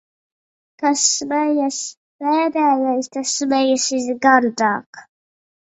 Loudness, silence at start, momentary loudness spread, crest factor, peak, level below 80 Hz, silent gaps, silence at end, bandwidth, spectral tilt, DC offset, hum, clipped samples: -18 LUFS; 0.8 s; 8 LU; 20 dB; 0 dBFS; -68 dBFS; 1.97-2.19 s, 4.86-4.93 s; 0.75 s; 8.4 kHz; -1.5 dB/octave; under 0.1%; none; under 0.1%